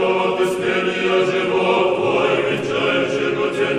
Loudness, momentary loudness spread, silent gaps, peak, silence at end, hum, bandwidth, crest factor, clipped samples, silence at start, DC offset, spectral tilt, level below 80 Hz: -18 LUFS; 3 LU; none; -4 dBFS; 0 s; none; 13 kHz; 14 dB; under 0.1%; 0 s; under 0.1%; -5 dB/octave; -56 dBFS